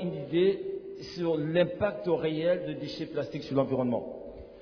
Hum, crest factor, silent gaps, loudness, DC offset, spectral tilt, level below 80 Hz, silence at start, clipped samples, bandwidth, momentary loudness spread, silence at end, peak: none; 16 dB; none; -30 LUFS; under 0.1%; -7.5 dB/octave; -60 dBFS; 0 s; under 0.1%; 5.4 kHz; 12 LU; 0 s; -14 dBFS